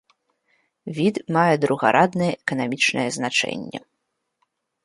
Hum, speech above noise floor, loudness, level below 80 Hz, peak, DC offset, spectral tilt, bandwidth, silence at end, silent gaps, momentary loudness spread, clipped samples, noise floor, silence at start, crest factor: none; 56 dB; -21 LUFS; -64 dBFS; -2 dBFS; under 0.1%; -4.5 dB/octave; 11.5 kHz; 1.05 s; none; 15 LU; under 0.1%; -77 dBFS; 0.85 s; 22 dB